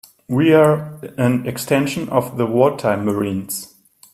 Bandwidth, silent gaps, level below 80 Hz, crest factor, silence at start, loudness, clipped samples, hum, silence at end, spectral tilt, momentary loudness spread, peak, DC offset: 16 kHz; none; -56 dBFS; 18 dB; 0.3 s; -18 LUFS; under 0.1%; none; 0.5 s; -6 dB/octave; 11 LU; 0 dBFS; under 0.1%